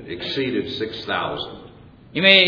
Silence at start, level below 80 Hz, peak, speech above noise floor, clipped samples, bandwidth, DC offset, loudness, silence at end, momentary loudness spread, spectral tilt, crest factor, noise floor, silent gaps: 0 s; -54 dBFS; 0 dBFS; 25 dB; under 0.1%; 5.4 kHz; under 0.1%; -22 LUFS; 0 s; 14 LU; -5.5 dB/octave; 22 dB; -45 dBFS; none